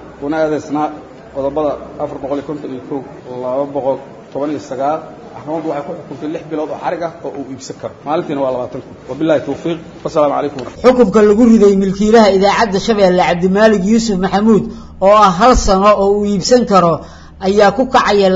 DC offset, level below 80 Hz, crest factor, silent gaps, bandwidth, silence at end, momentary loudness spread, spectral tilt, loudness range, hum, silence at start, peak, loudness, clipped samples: under 0.1%; -34 dBFS; 14 dB; none; 7.8 kHz; 0 s; 17 LU; -5.5 dB/octave; 11 LU; none; 0 s; 0 dBFS; -13 LUFS; under 0.1%